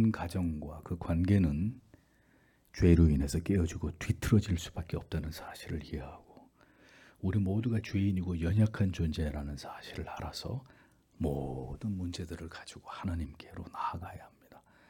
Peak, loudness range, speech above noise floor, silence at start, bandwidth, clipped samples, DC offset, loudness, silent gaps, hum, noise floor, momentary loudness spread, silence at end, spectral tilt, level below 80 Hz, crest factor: -10 dBFS; 9 LU; 34 dB; 0 s; 18 kHz; under 0.1%; under 0.1%; -33 LUFS; none; none; -67 dBFS; 16 LU; 0.35 s; -7 dB/octave; -46 dBFS; 22 dB